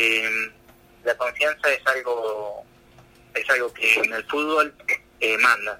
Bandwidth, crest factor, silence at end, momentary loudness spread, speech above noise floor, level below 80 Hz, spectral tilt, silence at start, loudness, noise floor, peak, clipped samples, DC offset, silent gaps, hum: 16.5 kHz; 20 dB; 0 s; 12 LU; 29 dB; -62 dBFS; -1.5 dB/octave; 0 s; -22 LUFS; -52 dBFS; -4 dBFS; under 0.1%; under 0.1%; none; none